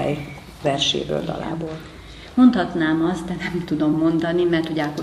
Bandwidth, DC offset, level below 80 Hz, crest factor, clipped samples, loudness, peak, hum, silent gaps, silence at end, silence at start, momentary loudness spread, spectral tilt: 12.5 kHz; under 0.1%; -46 dBFS; 18 dB; under 0.1%; -21 LUFS; -4 dBFS; none; none; 0 s; 0 s; 15 LU; -5.5 dB/octave